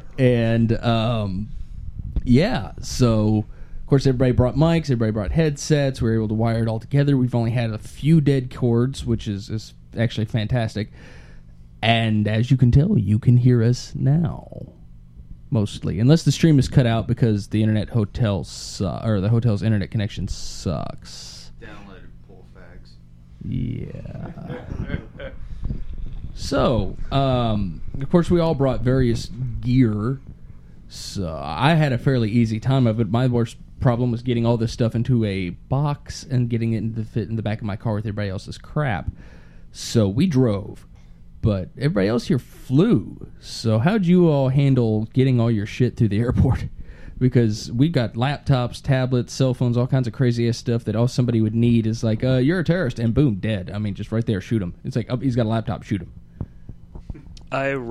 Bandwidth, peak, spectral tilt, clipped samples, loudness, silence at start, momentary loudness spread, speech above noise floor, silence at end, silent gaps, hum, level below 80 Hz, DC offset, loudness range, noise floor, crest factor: 11.5 kHz; -2 dBFS; -7.5 dB/octave; under 0.1%; -21 LUFS; 0.05 s; 15 LU; 24 dB; 0 s; none; none; -36 dBFS; under 0.1%; 7 LU; -44 dBFS; 20 dB